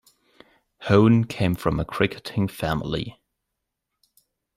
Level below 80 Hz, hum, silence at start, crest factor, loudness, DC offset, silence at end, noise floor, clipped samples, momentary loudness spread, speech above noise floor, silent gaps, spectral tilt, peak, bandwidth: -46 dBFS; none; 0.8 s; 20 dB; -23 LUFS; under 0.1%; 1.45 s; -81 dBFS; under 0.1%; 13 LU; 60 dB; none; -7.5 dB/octave; -4 dBFS; 16 kHz